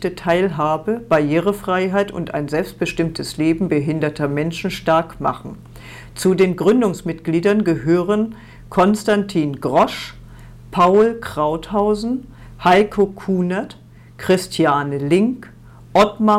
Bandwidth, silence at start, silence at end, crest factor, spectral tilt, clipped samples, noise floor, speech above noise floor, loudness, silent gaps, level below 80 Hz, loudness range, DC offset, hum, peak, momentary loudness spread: 16 kHz; 0 s; 0 s; 12 dB; -6.5 dB/octave; under 0.1%; -39 dBFS; 21 dB; -18 LUFS; none; -44 dBFS; 3 LU; under 0.1%; none; -6 dBFS; 10 LU